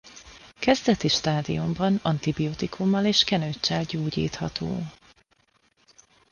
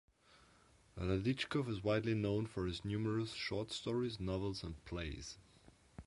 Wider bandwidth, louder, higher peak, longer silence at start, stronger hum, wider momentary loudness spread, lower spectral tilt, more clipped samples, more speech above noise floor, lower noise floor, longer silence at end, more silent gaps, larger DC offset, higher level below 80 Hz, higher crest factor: second, 10 kHz vs 11.5 kHz; first, -25 LUFS vs -40 LUFS; first, -6 dBFS vs -22 dBFS; second, 0.05 s vs 0.95 s; neither; about the same, 10 LU vs 10 LU; about the same, -5 dB/octave vs -6 dB/octave; neither; first, 41 dB vs 29 dB; about the same, -66 dBFS vs -68 dBFS; first, 1.4 s vs 0.05 s; neither; neither; about the same, -52 dBFS vs -56 dBFS; about the same, 20 dB vs 20 dB